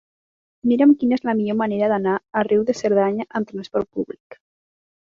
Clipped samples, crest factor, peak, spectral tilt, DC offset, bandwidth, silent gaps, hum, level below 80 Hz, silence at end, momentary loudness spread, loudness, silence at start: under 0.1%; 16 dB; -6 dBFS; -7 dB/octave; under 0.1%; 7.6 kHz; 4.20-4.30 s; none; -62 dBFS; 0.8 s; 12 LU; -20 LUFS; 0.65 s